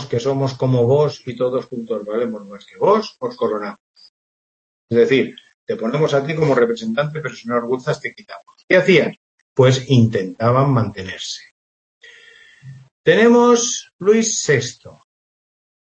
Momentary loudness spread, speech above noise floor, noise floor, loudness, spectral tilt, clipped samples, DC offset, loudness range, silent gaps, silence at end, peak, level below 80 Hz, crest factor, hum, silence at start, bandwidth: 14 LU; 29 dB; -47 dBFS; -18 LUFS; -5 dB/octave; under 0.1%; under 0.1%; 5 LU; 3.80-3.94 s, 4.09-4.88 s, 5.54-5.67 s, 8.64-8.68 s, 9.17-9.56 s, 11.51-12.01 s, 12.91-13.04 s, 13.93-13.99 s; 0.95 s; -2 dBFS; -60 dBFS; 18 dB; none; 0 s; 8.6 kHz